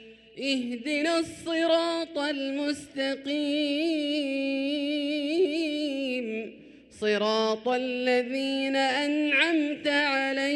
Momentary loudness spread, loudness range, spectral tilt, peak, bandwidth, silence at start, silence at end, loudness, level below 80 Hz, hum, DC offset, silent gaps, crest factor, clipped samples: 7 LU; 3 LU; -3.5 dB/octave; -10 dBFS; 12 kHz; 0 s; 0 s; -27 LUFS; -70 dBFS; none; under 0.1%; none; 18 dB; under 0.1%